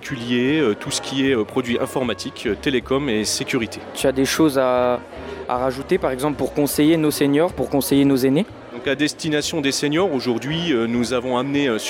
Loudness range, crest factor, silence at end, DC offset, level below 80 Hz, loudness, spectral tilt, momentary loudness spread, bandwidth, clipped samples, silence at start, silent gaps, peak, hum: 2 LU; 14 dB; 0 s; under 0.1%; -48 dBFS; -20 LUFS; -4.5 dB/octave; 7 LU; 17 kHz; under 0.1%; 0 s; none; -6 dBFS; none